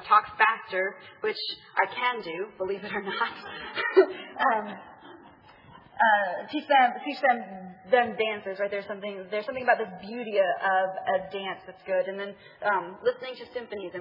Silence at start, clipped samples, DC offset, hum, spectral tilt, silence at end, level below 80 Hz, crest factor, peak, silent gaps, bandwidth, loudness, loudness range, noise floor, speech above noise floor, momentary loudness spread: 0 s; under 0.1%; under 0.1%; none; -6.5 dB/octave; 0 s; -72 dBFS; 22 dB; -6 dBFS; none; 5.8 kHz; -27 LUFS; 3 LU; -53 dBFS; 25 dB; 14 LU